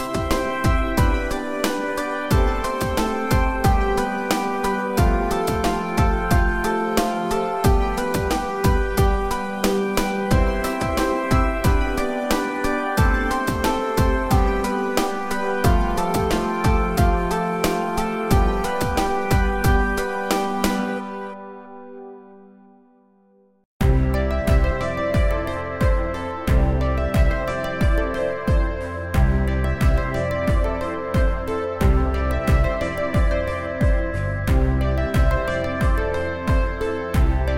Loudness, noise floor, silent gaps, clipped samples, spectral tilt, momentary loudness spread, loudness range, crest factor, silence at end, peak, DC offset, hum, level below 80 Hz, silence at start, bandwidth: -22 LUFS; -57 dBFS; 23.65-23.80 s; under 0.1%; -6 dB/octave; 5 LU; 2 LU; 16 dB; 0 s; -4 dBFS; 0.8%; none; -24 dBFS; 0 s; 16.5 kHz